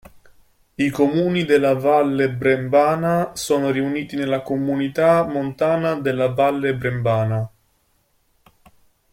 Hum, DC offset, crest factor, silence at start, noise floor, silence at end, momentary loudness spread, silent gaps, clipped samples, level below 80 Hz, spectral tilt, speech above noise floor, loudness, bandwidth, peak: none; under 0.1%; 16 dB; 0.8 s; -64 dBFS; 1.65 s; 7 LU; none; under 0.1%; -54 dBFS; -6.5 dB/octave; 45 dB; -19 LUFS; 16.5 kHz; -4 dBFS